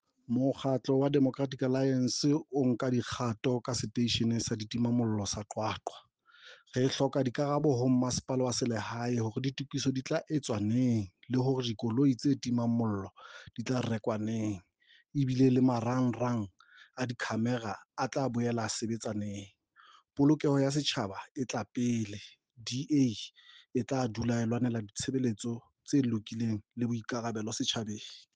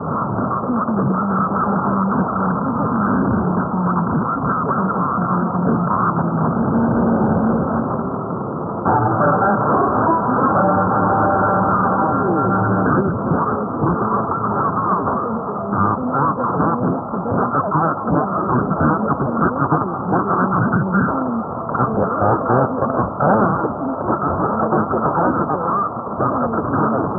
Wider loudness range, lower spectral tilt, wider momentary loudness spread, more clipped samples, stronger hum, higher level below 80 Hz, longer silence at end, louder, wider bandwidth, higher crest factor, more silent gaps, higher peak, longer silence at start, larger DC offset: about the same, 3 LU vs 3 LU; second, -5.5 dB/octave vs -15 dB/octave; first, 10 LU vs 5 LU; neither; neither; second, -66 dBFS vs -42 dBFS; first, 0.15 s vs 0 s; second, -32 LUFS vs -18 LUFS; first, 9.6 kHz vs 1.9 kHz; about the same, 16 dB vs 16 dB; first, 21.31-21.35 s vs none; second, -16 dBFS vs -2 dBFS; first, 0.3 s vs 0 s; neither